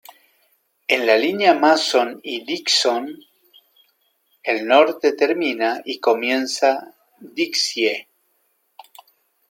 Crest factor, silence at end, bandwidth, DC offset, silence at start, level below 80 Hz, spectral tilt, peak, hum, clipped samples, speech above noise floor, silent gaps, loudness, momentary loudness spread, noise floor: 20 dB; 1.5 s; 17 kHz; under 0.1%; 0.9 s; -78 dBFS; -2 dB/octave; -2 dBFS; none; under 0.1%; 48 dB; none; -19 LUFS; 12 LU; -66 dBFS